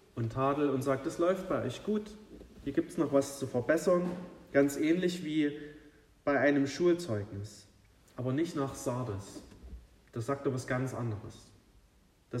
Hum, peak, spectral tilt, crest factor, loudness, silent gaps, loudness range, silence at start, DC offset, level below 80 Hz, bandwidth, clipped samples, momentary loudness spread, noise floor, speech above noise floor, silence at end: none; -14 dBFS; -6 dB/octave; 18 dB; -32 LUFS; none; 7 LU; 0.15 s; under 0.1%; -60 dBFS; 15.5 kHz; under 0.1%; 19 LU; -65 dBFS; 33 dB; 0 s